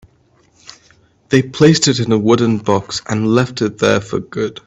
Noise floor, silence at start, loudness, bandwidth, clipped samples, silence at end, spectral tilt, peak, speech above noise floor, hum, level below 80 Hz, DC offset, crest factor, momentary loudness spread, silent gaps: -54 dBFS; 1.3 s; -15 LUFS; 8.4 kHz; under 0.1%; 0.15 s; -5 dB/octave; 0 dBFS; 40 dB; none; -50 dBFS; under 0.1%; 16 dB; 9 LU; none